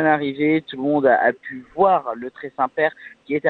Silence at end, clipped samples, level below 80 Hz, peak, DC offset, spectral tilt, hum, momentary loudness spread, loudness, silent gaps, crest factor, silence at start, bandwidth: 0 s; under 0.1%; -62 dBFS; -2 dBFS; under 0.1%; -8.5 dB/octave; none; 14 LU; -20 LUFS; none; 18 dB; 0 s; 4.5 kHz